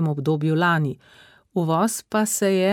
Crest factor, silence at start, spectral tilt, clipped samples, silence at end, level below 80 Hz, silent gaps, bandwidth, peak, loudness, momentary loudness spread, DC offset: 14 dB; 0 s; -5 dB/octave; under 0.1%; 0 s; -66 dBFS; none; 17 kHz; -8 dBFS; -22 LUFS; 9 LU; under 0.1%